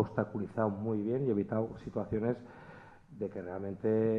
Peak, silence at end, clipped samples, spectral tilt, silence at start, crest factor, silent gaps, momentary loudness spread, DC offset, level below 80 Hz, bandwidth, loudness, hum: -14 dBFS; 0 s; under 0.1%; -10.5 dB/octave; 0 s; 20 dB; none; 19 LU; under 0.1%; -64 dBFS; 6.2 kHz; -35 LUFS; none